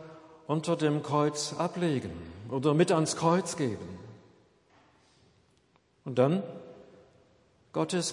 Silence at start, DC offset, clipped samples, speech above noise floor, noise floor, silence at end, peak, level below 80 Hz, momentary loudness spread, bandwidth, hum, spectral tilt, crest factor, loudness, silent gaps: 0 s; under 0.1%; under 0.1%; 39 dB; -67 dBFS; 0 s; -10 dBFS; -72 dBFS; 21 LU; 11.5 kHz; none; -5.5 dB/octave; 20 dB; -29 LUFS; none